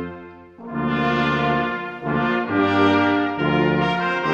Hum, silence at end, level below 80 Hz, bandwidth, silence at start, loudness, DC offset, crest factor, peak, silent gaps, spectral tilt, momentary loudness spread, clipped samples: none; 0 s; -48 dBFS; 7.4 kHz; 0 s; -20 LUFS; under 0.1%; 16 dB; -4 dBFS; none; -7 dB/octave; 11 LU; under 0.1%